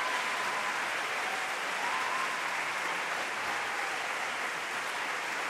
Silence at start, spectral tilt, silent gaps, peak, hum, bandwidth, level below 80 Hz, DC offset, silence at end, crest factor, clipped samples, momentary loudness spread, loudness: 0 s; -0.5 dB/octave; none; -18 dBFS; none; 16 kHz; -80 dBFS; under 0.1%; 0 s; 14 dB; under 0.1%; 2 LU; -32 LUFS